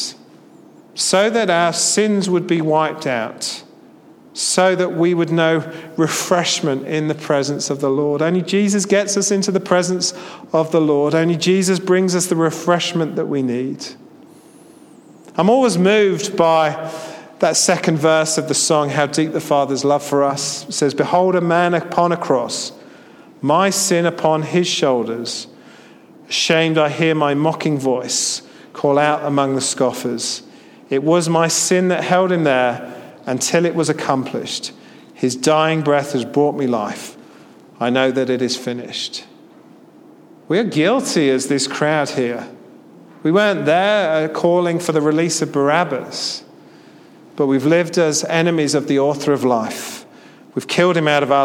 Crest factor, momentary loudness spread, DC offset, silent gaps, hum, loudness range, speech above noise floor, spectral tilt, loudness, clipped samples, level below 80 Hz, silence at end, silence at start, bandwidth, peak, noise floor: 16 dB; 10 LU; under 0.1%; none; none; 3 LU; 28 dB; -4 dB/octave; -17 LUFS; under 0.1%; -68 dBFS; 0 s; 0 s; 16.5 kHz; 0 dBFS; -45 dBFS